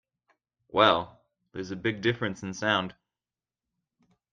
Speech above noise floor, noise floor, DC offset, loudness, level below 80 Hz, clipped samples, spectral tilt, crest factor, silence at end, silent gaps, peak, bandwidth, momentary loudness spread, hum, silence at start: over 63 dB; under -90 dBFS; under 0.1%; -27 LUFS; -66 dBFS; under 0.1%; -5 dB/octave; 24 dB; 1.4 s; none; -6 dBFS; 7.6 kHz; 18 LU; none; 0.75 s